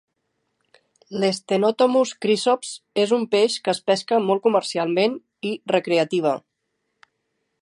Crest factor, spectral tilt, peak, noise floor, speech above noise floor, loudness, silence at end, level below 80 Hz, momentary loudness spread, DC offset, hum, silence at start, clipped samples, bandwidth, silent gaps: 18 dB; -4.5 dB/octave; -4 dBFS; -76 dBFS; 55 dB; -21 LUFS; 1.25 s; -76 dBFS; 8 LU; under 0.1%; none; 1.1 s; under 0.1%; 11.5 kHz; none